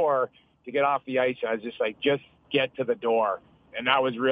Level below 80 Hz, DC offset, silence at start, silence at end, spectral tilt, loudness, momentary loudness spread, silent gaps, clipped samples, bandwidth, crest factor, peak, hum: -70 dBFS; under 0.1%; 0 s; 0 s; -7.5 dB/octave; -27 LUFS; 8 LU; none; under 0.1%; 5 kHz; 20 dB; -6 dBFS; none